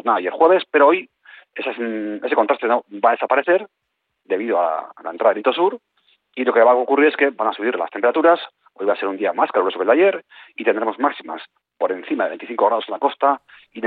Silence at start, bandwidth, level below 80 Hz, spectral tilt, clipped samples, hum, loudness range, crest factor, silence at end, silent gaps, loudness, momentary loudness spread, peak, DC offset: 0.05 s; 4.7 kHz; -74 dBFS; -8 dB/octave; under 0.1%; none; 4 LU; 18 dB; 0 s; none; -19 LUFS; 12 LU; -2 dBFS; under 0.1%